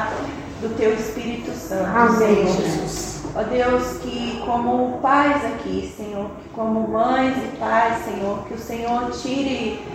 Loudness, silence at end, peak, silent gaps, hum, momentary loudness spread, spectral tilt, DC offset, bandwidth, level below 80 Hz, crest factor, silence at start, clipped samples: -21 LUFS; 0 s; -2 dBFS; none; none; 12 LU; -5 dB/octave; under 0.1%; 16 kHz; -44 dBFS; 20 dB; 0 s; under 0.1%